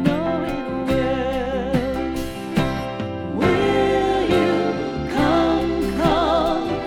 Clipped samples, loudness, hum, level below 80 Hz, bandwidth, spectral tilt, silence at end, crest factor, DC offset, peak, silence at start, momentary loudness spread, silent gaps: under 0.1%; -21 LUFS; none; -36 dBFS; 17.5 kHz; -6.5 dB/octave; 0 s; 16 dB; under 0.1%; -4 dBFS; 0 s; 7 LU; none